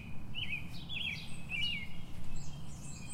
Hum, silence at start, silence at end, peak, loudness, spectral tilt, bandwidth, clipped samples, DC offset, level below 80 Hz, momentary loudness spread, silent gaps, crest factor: none; 0 s; 0 s; -24 dBFS; -40 LUFS; -3 dB/octave; 13 kHz; under 0.1%; under 0.1%; -48 dBFS; 12 LU; none; 12 dB